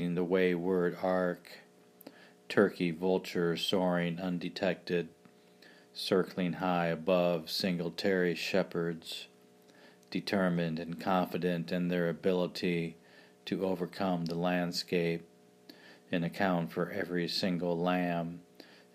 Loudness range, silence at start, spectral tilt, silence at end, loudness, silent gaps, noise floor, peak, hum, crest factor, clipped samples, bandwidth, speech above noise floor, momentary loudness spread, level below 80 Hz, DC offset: 2 LU; 0 s; -6 dB/octave; 0.3 s; -33 LUFS; none; -60 dBFS; -12 dBFS; none; 22 dB; under 0.1%; 15.5 kHz; 28 dB; 9 LU; -72 dBFS; under 0.1%